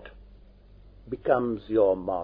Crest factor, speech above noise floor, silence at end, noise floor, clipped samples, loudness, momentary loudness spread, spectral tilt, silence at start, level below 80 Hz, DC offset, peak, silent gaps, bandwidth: 18 dB; 27 dB; 0 s; -52 dBFS; under 0.1%; -26 LUFS; 10 LU; -10.5 dB/octave; 0 s; -52 dBFS; under 0.1%; -10 dBFS; none; 5 kHz